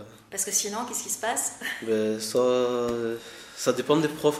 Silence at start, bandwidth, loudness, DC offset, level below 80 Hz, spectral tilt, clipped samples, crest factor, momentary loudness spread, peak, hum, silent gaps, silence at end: 0 s; 16 kHz; -26 LUFS; under 0.1%; -64 dBFS; -3 dB/octave; under 0.1%; 20 dB; 9 LU; -8 dBFS; none; none; 0 s